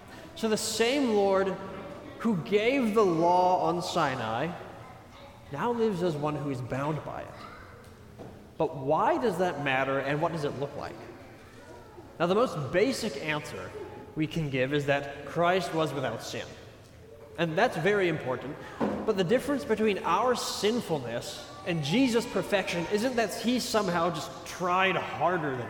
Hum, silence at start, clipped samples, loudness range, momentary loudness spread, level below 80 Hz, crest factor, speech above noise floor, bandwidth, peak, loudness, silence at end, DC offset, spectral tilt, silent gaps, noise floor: none; 0 s; under 0.1%; 5 LU; 19 LU; -60 dBFS; 18 dB; 22 dB; 19 kHz; -10 dBFS; -28 LUFS; 0 s; under 0.1%; -5 dB/octave; none; -50 dBFS